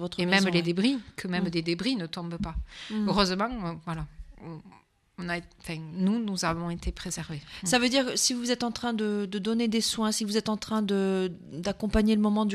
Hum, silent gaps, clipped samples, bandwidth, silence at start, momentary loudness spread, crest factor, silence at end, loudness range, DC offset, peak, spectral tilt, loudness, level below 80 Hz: none; none; under 0.1%; 13.5 kHz; 0 s; 13 LU; 20 dB; 0 s; 6 LU; under 0.1%; -10 dBFS; -4 dB/octave; -28 LUFS; -46 dBFS